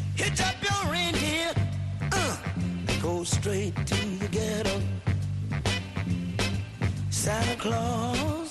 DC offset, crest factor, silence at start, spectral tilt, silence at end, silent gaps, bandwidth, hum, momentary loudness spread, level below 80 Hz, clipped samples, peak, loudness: under 0.1%; 16 dB; 0 s; -4.5 dB/octave; 0 s; none; 12.5 kHz; none; 5 LU; -44 dBFS; under 0.1%; -12 dBFS; -28 LUFS